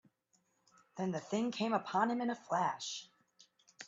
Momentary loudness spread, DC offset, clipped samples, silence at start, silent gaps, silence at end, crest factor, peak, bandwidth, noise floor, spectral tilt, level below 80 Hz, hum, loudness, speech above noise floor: 9 LU; under 0.1%; under 0.1%; 0.95 s; none; 0 s; 20 dB; -18 dBFS; 7.8 kHz; -78 dBFS; -4.5 dB/octave; -82 dBFS; none; -37 LUFS; 42 dB